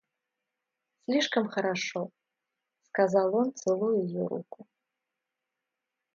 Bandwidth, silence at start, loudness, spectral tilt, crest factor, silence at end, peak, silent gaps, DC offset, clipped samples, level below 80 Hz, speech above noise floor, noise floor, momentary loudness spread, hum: 7.6 kHz; 1.1 s; -29 LUFS; -5 dB/octave; 20 dB; 1.5 s; -10 dBFS; none; under 0.1%; under 0.1%; -82 dBFS; 58 dB; -87 dBFS; 13 LU; none